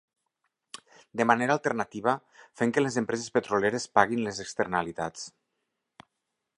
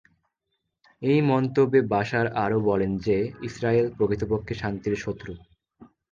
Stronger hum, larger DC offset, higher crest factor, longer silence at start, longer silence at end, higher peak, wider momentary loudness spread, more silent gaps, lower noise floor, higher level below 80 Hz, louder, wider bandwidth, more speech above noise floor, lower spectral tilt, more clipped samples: neither; neither; first, 26 dB vs 18 dB; first, 1.15 s vs 1 s; first, 1.3 s vs 0.25 s; first, -4 dBFS vs -8 dBFS; first, 18 LU vs 10 LU; neither; first, -83 dBFS vs -79 dBFS; second, -66 dBFS vs -50 dBFS; second, -28 LUFS vs -25 LUFS; first, 11 kHz vs 7.4 kHz; about the same, 55 dB vs 55 dB; second, -4.5 dB/octave vs -8 dB/octave; neither